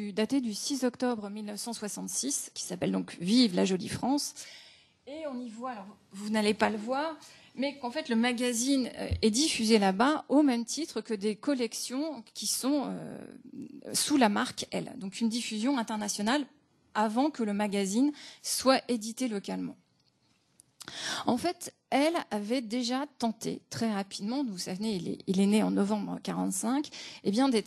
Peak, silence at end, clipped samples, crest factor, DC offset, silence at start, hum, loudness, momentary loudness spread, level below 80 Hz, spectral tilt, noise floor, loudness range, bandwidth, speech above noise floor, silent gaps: -10 dBFS; 0 s; under 0.1%; 22 dB; under 0.1%; 0 s; none; -30 LUFS; 13 LU; -62 dBFS; -4 dB/octave; -70 dBFS; 6 LU; 13 kHz; 40 dB; none